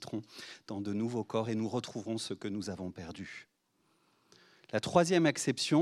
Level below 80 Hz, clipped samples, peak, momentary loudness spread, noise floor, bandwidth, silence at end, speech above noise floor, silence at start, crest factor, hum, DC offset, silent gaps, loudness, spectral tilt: -74 dBFS; under 0.1%; -10 dBFS; 17 LU; -74 dBFS; 14 kHz; 0 s; 41 dB; 0 s; 24 dB; none; under 0.1%; none; -34 LUFS; -5 dB/octave